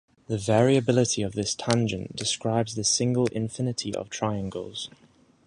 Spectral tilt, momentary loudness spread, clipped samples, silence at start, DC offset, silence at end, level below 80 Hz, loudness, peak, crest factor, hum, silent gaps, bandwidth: -4.5 dB/octave; 12 LU; under 0.1%; 0.3 s; under 0.1%; 0.6 s; -56 dBFS; -26 LUFS; -2 dBFS; 24 dB; none; none; 11.5 kHz